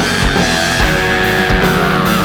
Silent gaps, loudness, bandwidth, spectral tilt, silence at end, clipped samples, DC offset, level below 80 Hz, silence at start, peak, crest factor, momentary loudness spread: none; -12 LUFS; over 20 kHz; -4 dB/octave; 0 s; under 0.1%; under 0.1%; -24 dBFS; 0 s; 0 dBFS; 12 dB; 1 LU